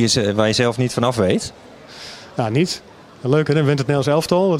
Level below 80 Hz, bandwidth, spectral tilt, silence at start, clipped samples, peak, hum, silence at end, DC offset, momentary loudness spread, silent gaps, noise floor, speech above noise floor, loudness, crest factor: -52 dBFS; 15.5 kHz; -5.5 dB/octave; 0 s; under 0.1%; 0 dBFS; none; 0 s; under 0.1%; 15 LU; none; -37 dBFS; 20 dB; -18 LUFS; 18 dB